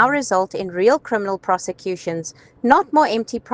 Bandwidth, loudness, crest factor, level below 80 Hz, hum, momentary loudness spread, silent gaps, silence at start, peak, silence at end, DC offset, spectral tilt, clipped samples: 10 kHz; -19 LUFS; 20 dB; -60 dBFS; none; 11 LU; none; 0 s; 0 dBFS; 0 s; under 0.1%; -4.5 dB/octave; under 0.1%